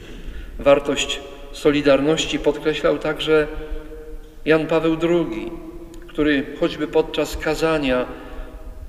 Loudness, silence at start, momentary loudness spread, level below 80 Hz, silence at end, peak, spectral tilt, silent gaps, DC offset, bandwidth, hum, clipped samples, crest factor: -20 LUFS; 0 s; 20 LU; -36 dBFS; 0 s; -2 dBFS; -4.5 dB/octave; none; under 0.1%; 15 kHz; none; under 0.1%; 18 dB